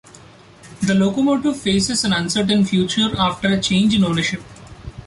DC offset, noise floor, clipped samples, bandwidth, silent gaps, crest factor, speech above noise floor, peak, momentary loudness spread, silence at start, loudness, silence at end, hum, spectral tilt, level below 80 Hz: under 0.1%; -44 dBFS; under 0.1%; 11.5 kHz; none; 14 dB; 27 dB; -6 dBFS; 7 LU; 0.65 s; -18 LUFS; 0 s; none; -4.5 dB/octave; -44 dBFS